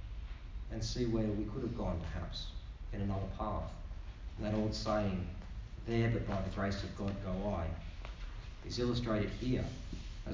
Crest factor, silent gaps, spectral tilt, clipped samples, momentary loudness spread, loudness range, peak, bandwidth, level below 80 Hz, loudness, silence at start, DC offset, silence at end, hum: 16 dB; none; -6.5 dB/octave; under 0.1%; 13 LU; 3 LU; -22 dBFS; 7.6 kHz; -44 dBFS; -39 LUFS; 0 s; under 0.1%; 0 s; none